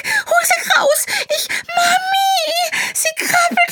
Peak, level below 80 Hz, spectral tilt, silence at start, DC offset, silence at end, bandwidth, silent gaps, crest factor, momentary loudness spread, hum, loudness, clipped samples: -2 dBFS; -68 dBFS; 0.5 dB/octave; 0.05 s; under 0.1%; 0 s; 19.5 kHz; none; 14 dB; 5 LU; none; -15 LUFS; under 0.1%